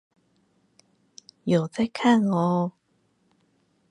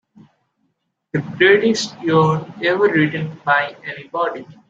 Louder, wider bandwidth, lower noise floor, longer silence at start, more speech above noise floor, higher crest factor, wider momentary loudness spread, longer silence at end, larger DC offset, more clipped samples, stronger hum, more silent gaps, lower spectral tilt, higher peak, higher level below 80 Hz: second, -24 LUFS vs -18 LUFS; first, 10.5 kHz vs 7.8 kHz; about the same, -68 dBFS vs -70 dBFS; first, 1.45 s vs 1.15 s; second, 46 dB vs 52 dB; about the same, 20 dB vs 18 dB; second, 10 LU vs 13 LU; first, 1.2 s vs 0.15 s; neither; neither; neither; neither; first, -7 dB/octave vs -5.5 dB/octave; second, -8 dBFS vs -2 dBFS; second, -68 dBFS vs -62 dBFS